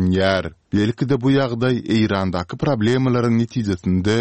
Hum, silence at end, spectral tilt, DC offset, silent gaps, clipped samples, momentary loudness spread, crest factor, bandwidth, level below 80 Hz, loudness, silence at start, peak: none; 0 s; -7 dB/octave; 0.3%; none; under 0.1%; 5 LU; 16 dB; 8.8 kHz; -46 dBFS; -19 LUFS; 0 s; -2 dBFS